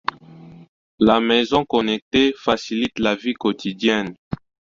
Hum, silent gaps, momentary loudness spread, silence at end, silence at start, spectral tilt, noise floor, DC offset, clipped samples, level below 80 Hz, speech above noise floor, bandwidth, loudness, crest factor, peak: none; 0.69-0.98 s, 2.02-2.11 s, 4.18-4.31 s; 13 LU; 0.4 s; 0.3 s; -5 dB/octave; -43 dBFS; under 0.1%; under 0.1%; -52 dBFS; 23 dB; 7.6 kHz; -20 LUFS; 20 dB; -2 dBFS